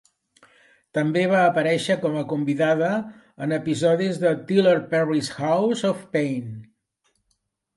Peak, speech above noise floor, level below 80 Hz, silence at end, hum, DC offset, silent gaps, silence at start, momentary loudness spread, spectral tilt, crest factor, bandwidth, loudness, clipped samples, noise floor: -6 dBFS; 51 dB; -68 dBFS; 1.15 s; none; under 0.1%; none; 0.95 s; 10 LU; -6 dB/octave; 16 dB; 11.5 kHz; -22 LUFS; under 0.1%; -73 dBFS